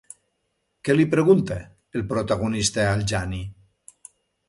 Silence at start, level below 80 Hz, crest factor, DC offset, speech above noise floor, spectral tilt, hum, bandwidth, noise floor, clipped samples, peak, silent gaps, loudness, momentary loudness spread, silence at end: 0.85 s; -44 dBFS; 18 dB; under 0.1%; 53 dB; -5.5 dB/octave; none; 11.5 kHz; -74 dBFS; under 0.1%; -6 dBFS; none; -22 LUFS; 14 LU; 0.95 s